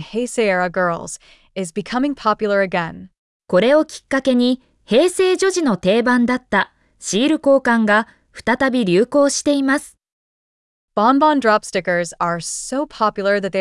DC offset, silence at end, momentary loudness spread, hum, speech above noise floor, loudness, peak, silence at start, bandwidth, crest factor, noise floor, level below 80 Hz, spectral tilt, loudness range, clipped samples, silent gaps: under 0.1%; 0 s; 11 LU; none; over 73 dB; -17 LUFS; -4 dBFS; 0 s; 12 kHz; 14 dB; under -90 dBFS; -54 dBFS; -4.5 dB/octave; 3 LU; under 0.1%; 3.18-3.40 s, 10.12-10.88 s